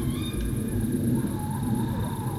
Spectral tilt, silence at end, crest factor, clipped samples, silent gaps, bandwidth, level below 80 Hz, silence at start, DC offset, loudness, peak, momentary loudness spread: -6.5 dB/octave; 0 s; 14 dB; under 0.1%; none; 17 kHz; -38 dBFS; 0 s; under 0.1%; -28 LUFS; -14 dBFS; 4 LU